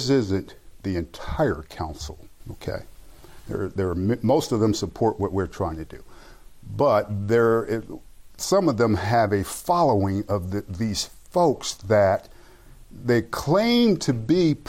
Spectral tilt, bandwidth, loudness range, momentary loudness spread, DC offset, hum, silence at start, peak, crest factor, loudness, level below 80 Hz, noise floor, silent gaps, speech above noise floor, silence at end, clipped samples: -6 dB/octave; 16.5 kHz; 6 LU; 14 LU; under 0.1%; none; 0 s; -10 dBFS; 14 dB; -23 LUFS; -46 dBFS; -47 dBFS; none; 24 dB; 0.05 s; under 0.1%